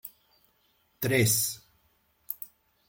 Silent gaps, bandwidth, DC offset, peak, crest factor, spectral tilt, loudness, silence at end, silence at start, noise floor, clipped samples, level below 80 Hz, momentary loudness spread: none; 17 kHz; under 0.1%; -12 dBFS; 22 dB; -3.5 dB/octave; -27 LUFS; 0.4 s; 0.05 s; -70 dBFS; under 0.1%; -66 dBFS; 21 LU